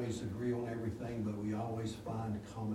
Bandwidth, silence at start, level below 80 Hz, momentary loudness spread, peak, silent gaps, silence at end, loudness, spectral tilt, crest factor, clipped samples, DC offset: 15 kHz; 0 s; -62 dBFS; 3 LU; -26 dBFS; none; 0 s; -40 LUFS; -7 dB/octave; 12 dB; under 0.1%; under 0.1%